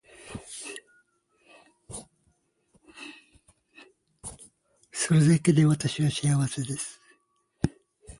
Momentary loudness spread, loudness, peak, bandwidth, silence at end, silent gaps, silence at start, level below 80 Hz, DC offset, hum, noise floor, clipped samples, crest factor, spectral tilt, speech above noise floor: 23 LU; -26 LUFS; -8 dBFS; 11.5 kHz; 0.1 s; none; 0.25 s; -56 dBFS; under 0.1%; none; -70 dBFS; under 0.1%; 20 dB; -5.5 dB/octave; 47 dB